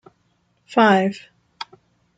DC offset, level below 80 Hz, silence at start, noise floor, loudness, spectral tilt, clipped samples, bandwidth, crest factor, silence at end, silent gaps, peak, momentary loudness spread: under 0.1%; -68 dBFS; 0.7 s; -65 dBFS; -18 LUFS; -6 dB/octave; under 0.1%; 9 kHz; 18 dB; 0.55 s; none; -4 dBFS; 21 LU